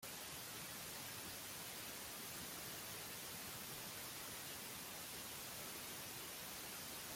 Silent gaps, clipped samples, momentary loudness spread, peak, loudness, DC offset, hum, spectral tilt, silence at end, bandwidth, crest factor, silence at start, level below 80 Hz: none; under 0.1%; 1 LU; -36 dBFS; -48 LUFS; under 0.1%; none; -1.5 dB/octave; 0 s; 16.5 kHz; 16 dB; 0 s; -74 dBFS